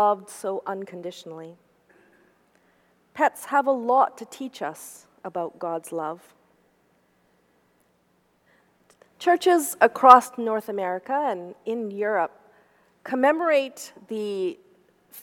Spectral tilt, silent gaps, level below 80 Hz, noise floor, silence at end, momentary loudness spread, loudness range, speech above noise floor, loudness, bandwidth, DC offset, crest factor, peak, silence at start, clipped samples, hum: -4 dB/octave; none; -76 dBFS; -66 dBFS; 0 s; 20 LU; 15 LU; 43 dB; -23 LUFS; 18.5 kHz; under 0.1%; 26 dB; 0 dBFS; 0 s; under 0.1%; none